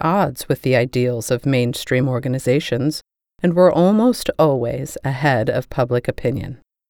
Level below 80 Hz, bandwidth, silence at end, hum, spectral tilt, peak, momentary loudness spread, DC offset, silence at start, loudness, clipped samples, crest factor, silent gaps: -46 dBFS; 19.5 kHz; 0.35 s; none; -6.5 dB/octave; 0 dBFS; 9 LU; under 0.1%; 0 s; -18 LUFS; under 0.1%; 18 dB; none